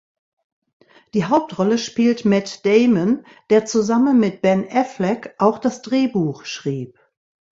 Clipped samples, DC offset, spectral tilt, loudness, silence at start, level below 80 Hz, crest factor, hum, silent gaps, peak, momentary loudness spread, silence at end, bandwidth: under 0.1%; under 0.1%; -6 dB/octave; -19 LUFS; 1.15 s; -60 dBFS; 18 dB; none; none; -2 dBFS; 9 LU; 0.7 s; 7.8 kHz